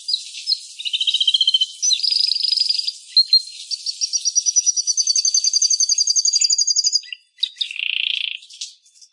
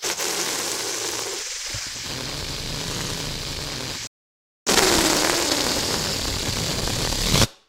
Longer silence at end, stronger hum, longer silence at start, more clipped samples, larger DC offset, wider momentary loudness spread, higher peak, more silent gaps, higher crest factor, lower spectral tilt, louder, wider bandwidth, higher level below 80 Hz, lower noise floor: first, 0.4 s vs 0.15 s; neither; about the same, 0 s vs 0 s; neither; neither; about the same, 10 LU vs 10 LU; second, -4 dBFS vs 0 dBFS; second, none vs 4.07-4.66 s; second, 16 dB vs 24 dB; second, 16 dB/octave vs -2 dB/octave; first, -16 LUFS vs -23 LUFS; second, 11.5 kHz vs 16 kHz; second, under -90 dBFS vs -38 dBFS; second, -39 dBFS vs under -90 dBFS